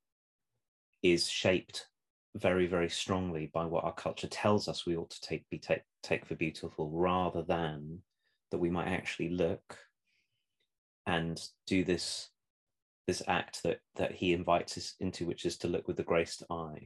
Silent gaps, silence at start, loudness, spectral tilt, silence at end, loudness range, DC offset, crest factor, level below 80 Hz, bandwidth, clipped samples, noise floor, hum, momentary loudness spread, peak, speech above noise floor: 2.10-2.33 s, 10.78-11.05 s, 12.50-12.67 s, 12.82-13.05 s; 1.05 s; -34 LUFS; -5 dB/octave; 0 s; 4 LU; under 0.1%; 22 dB; -66 dBFS; 12.5 kHz; under 0.1%; -84 dBFS; none; 10 LU; -14 dBFS; 50 dB